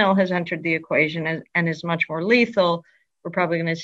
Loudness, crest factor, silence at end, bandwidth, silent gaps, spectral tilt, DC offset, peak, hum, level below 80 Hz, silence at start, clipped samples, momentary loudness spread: -22 LUFS; 18 dB; 0 s; 7.8 kHz; none; -6.5 dB/octave; under 0.1%; -4 dBFS; none; -66 dBFS; 0 s; under 0.1%; 8 LU